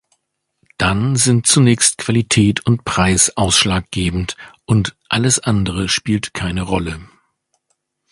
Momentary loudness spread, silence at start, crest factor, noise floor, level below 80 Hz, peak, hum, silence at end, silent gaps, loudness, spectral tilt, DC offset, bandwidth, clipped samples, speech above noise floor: 10 LU; 0.8 s; 16 dB; -69 dBFS; -36 dBFS; 0 dBFS; none; 1.05 s; none; -15 LUFS; -4 dB/octave; under 0.1%; 12 kHz; under 0.1%; 54 dB